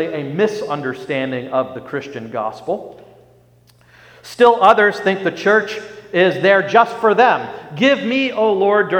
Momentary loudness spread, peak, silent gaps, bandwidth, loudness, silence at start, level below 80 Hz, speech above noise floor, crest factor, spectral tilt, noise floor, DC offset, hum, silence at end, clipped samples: 14 LU; 0 dBFS; none; 14.5 kHz; -16 LUFS; 0 s; -62 dBFS; 35 dB; 16 dB; -5.5 dB/octave; -51 dBFS; under 0.1%; 60 Hz at -50 dBFS; 0 s; under 0.1%